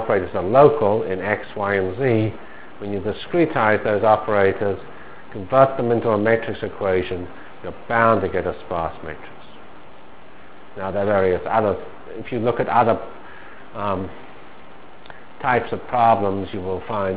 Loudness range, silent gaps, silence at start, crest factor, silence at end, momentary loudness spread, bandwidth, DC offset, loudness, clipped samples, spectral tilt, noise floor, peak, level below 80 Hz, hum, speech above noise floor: 5 LU; none; 0 s; 22 dB; 0 s; 20 LU; 4 kHz; 2%; -20 LUFS; under 0.1%; -10.5 dB/octave; -45 dBFS; 0 dBFS; -46 dBFS; none; 25 dB